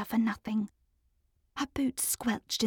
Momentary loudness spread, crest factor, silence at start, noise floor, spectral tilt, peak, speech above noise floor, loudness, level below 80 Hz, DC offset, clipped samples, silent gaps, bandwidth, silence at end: 9 LU; 16 dB; 0 s; -73 dBFS; -3 dB/octave; -18 dBFS; 41 dB; -32 LUFS; -60 dBFS; under 0.1%; under 0.1%; none; 20 kHz; 0 s